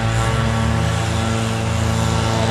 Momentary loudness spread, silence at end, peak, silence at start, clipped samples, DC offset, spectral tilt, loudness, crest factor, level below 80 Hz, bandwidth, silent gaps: 2 LU; 0 s; -6 dBFS; 0 s; under 0.1%; under 0.1%; -5.5 dB/octave; -19 LUFS; 12 dB; -28 dBFS; 13.5 kHz; none